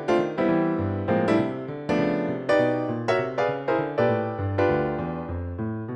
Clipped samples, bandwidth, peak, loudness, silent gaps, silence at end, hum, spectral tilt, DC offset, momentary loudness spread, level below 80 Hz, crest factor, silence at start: under 0.1%; 9.4 kHz; -8 dBFS; -25 LUFS; none; 0 s; none; -8 dB/octave; under 0.1%; 8 LU; -50 dBFS; 16 dB; 0 s